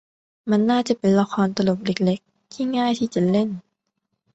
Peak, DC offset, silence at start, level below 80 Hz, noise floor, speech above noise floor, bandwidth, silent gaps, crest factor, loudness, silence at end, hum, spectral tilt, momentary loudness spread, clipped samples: -6 dBFS; under 0.1%; 0.45 s; -60 dBFS; -76 dBFS; 56 dB; 8.2 kHz; none; 16 dB; -21 LUFS; 0.75 s; none; -6.5 dB/octave; 9 LU; under 0.1%